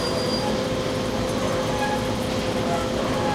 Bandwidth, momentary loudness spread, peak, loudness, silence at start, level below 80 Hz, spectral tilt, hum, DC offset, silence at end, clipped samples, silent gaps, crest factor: 16 kHz; 2 LU; -10 dBFS; -24 LUFS; 0 s; -40 dBFS; -5 dB/octave; none; under 0.1%; 0 s; under 0.1%; none; 14 dB